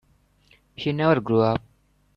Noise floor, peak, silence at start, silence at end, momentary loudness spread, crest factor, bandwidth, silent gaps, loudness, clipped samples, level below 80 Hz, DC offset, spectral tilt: -61 dBFS; -6 dBFS; 0.8 s; 0.55 s; 10 LU; 18 dB; 6.8 kHz; none; -23 LUFS; under 0.1%; -56 dBFS; under 0.1%; -8.5 dB/octave